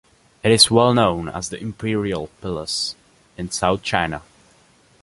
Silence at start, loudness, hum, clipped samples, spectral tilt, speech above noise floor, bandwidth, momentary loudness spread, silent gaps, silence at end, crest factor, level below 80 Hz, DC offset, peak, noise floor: 0.45 s; -19 LUFS; none; under 0.1%; -4 dB/octave; 35 dB; 11.5 kHz; 16 LU; none; 0.8 s; 22 dB; -46 dBFS; under 0.1%; 0 dBFS; -55 dBFS